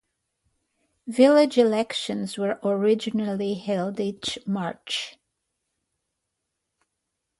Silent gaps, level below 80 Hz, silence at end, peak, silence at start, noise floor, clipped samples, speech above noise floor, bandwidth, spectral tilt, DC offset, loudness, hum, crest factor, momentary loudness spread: none; -68 dBFS; 2.3 s; -6 dBFS; 1.05 s; -81 dBFS; under 0.1%; 58 dB; 11.5 kHz; -5 dB/octave; under 0.1%; -24 LUFS; none; 20 dB; 12 LU